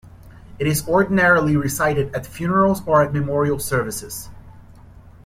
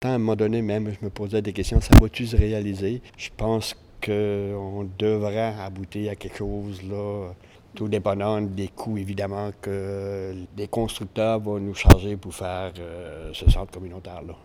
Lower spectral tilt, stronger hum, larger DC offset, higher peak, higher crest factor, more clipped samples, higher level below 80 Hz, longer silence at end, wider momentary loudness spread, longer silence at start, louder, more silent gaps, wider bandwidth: about the same, -5.5 dB/octave vs -6.5 dB/octave; neither; neither; second, -4 dBFS vs 0 dBFS; second, 16 dB vs 24 dB; neither; second, -44 dBFS vs -28 dBFS; about the same, 0.15 s vs 0.1 s; second, 12 LU vs 17 LU; about the same, 0.05 s vs 0 s; first, -19 LUFS vs -25 LUFS; neither; about the same, 16.5 kHz vs 17.5 kHz